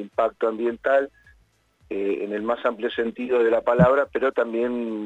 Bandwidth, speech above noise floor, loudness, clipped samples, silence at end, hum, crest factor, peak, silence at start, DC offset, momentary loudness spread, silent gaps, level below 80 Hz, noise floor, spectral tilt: 8 kHz; 39 dB; -23 LUFS; under 0.1%; 0 s; none; 18 dB; -4 dBFS; 0 s; under 0.1%; 9 LU; none; -52 dBFS; -61 dBFS; -8.5 dB/octave